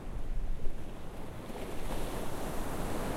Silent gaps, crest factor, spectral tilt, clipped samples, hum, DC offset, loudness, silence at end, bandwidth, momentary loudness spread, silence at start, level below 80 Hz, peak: none; 16 dB; -5.5 dB/octave; under 0.1%; none; under 0.1%; -41 LUFS; 0 s; 15.5 kHz; 8 LU; 0 s; -38 dBFS; -16 dBFS